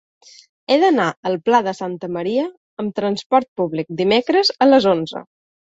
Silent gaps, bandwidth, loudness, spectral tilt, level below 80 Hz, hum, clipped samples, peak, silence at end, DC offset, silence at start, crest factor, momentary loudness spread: 1.17-1.23 s, 2.57-2.77 s, 3.26-3.30 s, 3.48-3.56 s; 8 kHz; -18 LUFS; -5.5 dB/octave; -62 dBFS; none; under 0.1%; -2 dBFS; 0.5 s; under 0.1%; 0.7 s; 16 dB; 13 LU